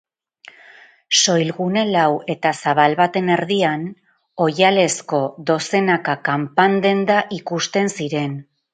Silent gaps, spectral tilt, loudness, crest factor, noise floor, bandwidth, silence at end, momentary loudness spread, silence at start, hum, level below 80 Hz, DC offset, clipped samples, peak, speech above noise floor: none; -4 dB/octave; -18 LUFS; 18 dB; -47 dBFS; 9.6 kHz; 0.3 s; 8 LU; 1.1 s; none; -66 dBFS; under 0.1%; under 0.1%; 0 dBFS; 29 dB